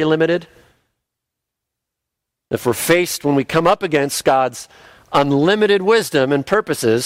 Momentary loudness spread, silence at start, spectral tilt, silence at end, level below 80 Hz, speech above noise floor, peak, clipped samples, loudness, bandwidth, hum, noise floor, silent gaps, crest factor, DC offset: 7 LU; 0 s; -4.5 dB/octave; 0 s; -54 dBFS; 65 dB; -2 dBFS; under 0.1%; -16 LUFS; 16 kHz; none; -81 dBFS; none; 14 dB; under 0.1%